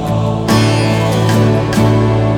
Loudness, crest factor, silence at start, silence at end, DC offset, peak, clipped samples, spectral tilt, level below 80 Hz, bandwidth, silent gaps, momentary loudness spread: -12 LUFS; 10 dB; 0 s; 0 s; under 0.1%; 0 dBFS; under 0.1%; -6.5 dB/octave; -32 dBFS; 15.5 kHz; none; 2 LU